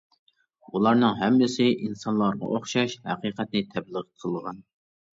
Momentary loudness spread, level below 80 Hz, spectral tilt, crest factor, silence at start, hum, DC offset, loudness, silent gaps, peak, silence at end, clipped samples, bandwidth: 13 LU; -66 dBFS; -5.5 dB/octave; 18 dB; 0.75 s; none; under 0.1%; -25 LUFS; none; -8 dBFS; 0.5 s; under 0.1%; 7.8 kHz